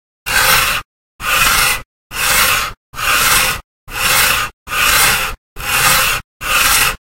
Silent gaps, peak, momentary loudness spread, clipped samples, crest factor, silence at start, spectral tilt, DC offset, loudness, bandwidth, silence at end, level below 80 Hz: 0.85-1.19 s, 1.85-2.10 s, 2.77-2.93 s, 3.64-3.87 s, 4.53-4.66 s, 5.38-5.56 s, 6.24-6.40 s; 0 dBFS; 11 LU; under 0.1%; 16 dB; 0.25 s; 0 dB/octave; under 0.1%; -12 LUFS; over 20 kHz; 0.25 s; -32 dBFS